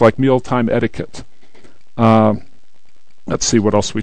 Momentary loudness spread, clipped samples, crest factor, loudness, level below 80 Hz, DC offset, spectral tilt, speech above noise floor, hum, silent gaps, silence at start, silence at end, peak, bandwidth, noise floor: 18 LU; 0.2%; 16 dB; -15 LUFS; -44 dBFS; 4%; -5.5 dB/octave; 44 dB; none; none; 0 s; 0 s; 0 dBFS; 9.2 kHz; -58 dBFS